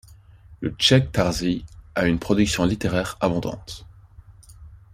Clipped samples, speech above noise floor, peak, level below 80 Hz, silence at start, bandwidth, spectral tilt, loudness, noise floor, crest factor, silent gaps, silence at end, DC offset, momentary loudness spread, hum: under 0.1%; 26 dB; -2 dBFS; -42 dBFS; 0.1 s; 15.5 kHz; -5 dB/octave; -22 LUFS; -48 dBFS; 22 dB; none; 0.2 s; under 0.1%; 14 LU; none